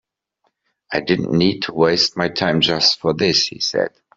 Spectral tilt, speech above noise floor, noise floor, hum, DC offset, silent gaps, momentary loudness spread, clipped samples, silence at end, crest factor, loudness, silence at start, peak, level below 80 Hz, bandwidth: -4 dB/octave; 51 dB; -69 dBFS; none; under 0.1%; none; 5 LU; under 0.1%; 0.3 s; 16 dB; -17 LUFS; 0.9 s; -2 dBFS; -54 dBFS; 7.8 kHz